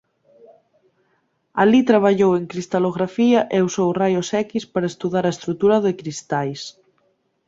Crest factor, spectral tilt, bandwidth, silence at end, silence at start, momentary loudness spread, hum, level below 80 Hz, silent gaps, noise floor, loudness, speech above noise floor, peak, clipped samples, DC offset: 18 dB; -6 dB/octave; 7.8 kHz; 0.8 s; 1.55 s; 10 LU; none; -60 dBFS; none; -67 dBFS; -19 LUFS; 48 dB; -2 dBFS; under 0.1%; under 0.1%